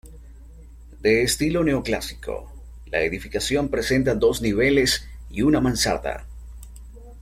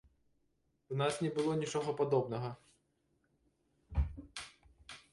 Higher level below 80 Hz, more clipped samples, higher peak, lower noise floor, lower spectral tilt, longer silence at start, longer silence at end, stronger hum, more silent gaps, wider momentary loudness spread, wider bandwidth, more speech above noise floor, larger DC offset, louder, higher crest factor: first, -38 dBFS vs -48 dBFS; neither; first, -6 dBFS vs -20 dBFS; second, -43 dBFS vs -78 dBFS; second, -4.5 dB/octave vs -6 dB/octave; second, 0.05 s vs 0.9 s; second, 0 s vs 0.15 s; neither; neither; about the same, 18 LU vs 20 LU; first, 16.5 kHz vs 11.5 kHz; second, 22 dB vs 43 dB; neither; first, -22 LUFS vs -37 LUFS; about the same, 18 dB vs 20 dB